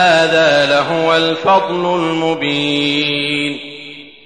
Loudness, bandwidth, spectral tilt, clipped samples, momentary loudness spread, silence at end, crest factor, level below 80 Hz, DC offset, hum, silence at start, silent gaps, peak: -14 LUFS; 10.5 kHz; -4.5 dB/octave; under 0.1%; 11 LU; 0.15 s; 14 dB; -58 dBFS; 0.3%; none; 0 s; none; -2 dBFS